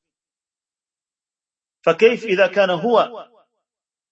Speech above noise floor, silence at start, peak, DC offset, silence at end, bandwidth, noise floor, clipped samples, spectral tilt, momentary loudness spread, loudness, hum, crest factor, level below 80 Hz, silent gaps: over 73 dB; 1.85 s; 0 dBFS; under 0.1%; 0.9 s; 7.8 kHz; under -90 dBFS; under 0.1%; -5.5 dB/octave; 6 LU; -17 LUFS; none; 20 dB; -76 dBFS; none